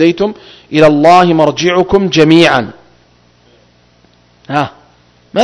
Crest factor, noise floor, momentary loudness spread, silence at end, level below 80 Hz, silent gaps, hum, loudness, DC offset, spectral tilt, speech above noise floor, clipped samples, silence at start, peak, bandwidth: 12 dB; -48 dBFS; 12 LU; 0 s; -42 dBFS; none; 60 Hz at -45 dBFS; -9 LUFS; under 0.1%; -5.5 dB/octave; 39 dB; 2%; 0 s; 0 dBFS; 11 kHz